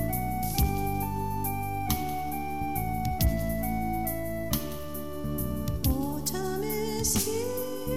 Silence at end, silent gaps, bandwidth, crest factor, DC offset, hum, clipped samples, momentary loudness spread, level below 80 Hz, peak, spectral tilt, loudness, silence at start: 0 s; none; 17 kHz; 18 dB; 1%; none; under 0.1%; 5 LU; -38 dBFS; -12 dBFS; -5 dB/octave; -30 LUFS; 0 s